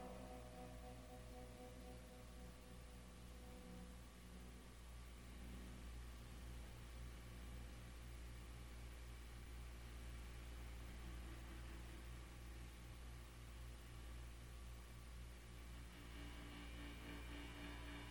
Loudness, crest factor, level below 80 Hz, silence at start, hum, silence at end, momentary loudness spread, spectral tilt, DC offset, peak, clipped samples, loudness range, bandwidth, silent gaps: -57 LUFS; 14 dB; -58 dBFS; 0 s; 60 Hz at -70 dBFS; 0 s; 5 LU; -5 dB/octave; under 0.1%; -42 dBFS; under 0.1%; 3 LU; 19.5 kHz; none